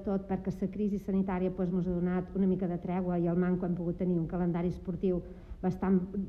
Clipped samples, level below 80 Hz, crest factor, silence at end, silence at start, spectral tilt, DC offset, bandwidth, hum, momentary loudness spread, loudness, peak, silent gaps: under 0.1%; -50 dBFS; 14 dB; 0 s; 0 s; -10.5 dB/octave; under 0.1%; 3.6 kHz; none; 5 LU; -32 LUFS; -18 dBFS; none